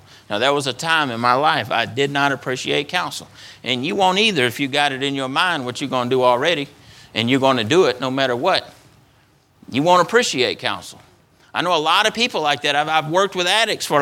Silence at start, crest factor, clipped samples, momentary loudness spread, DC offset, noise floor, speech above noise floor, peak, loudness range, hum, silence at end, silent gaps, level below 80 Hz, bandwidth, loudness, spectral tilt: 0.3 s; 18 dB; under 0.1%; 8 LU; under 0.1%; -56 dBFS; 37 dB; 0 dBFS; 2 LU; none; 0 s; none; -62 dBFS; 17.5 kHz; -18 LUFS; -3.5 dB/octave